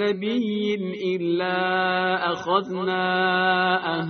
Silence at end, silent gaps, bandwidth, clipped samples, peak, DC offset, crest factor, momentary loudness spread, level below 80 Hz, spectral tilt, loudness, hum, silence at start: 0 s; none; 6.6 kHz; under 0.1%; -8 dBFS; under 0.1%; 16 dB; 6 LU; -66 dBFS; -2.5 dB/octave; -23 LUFS; none; 0 s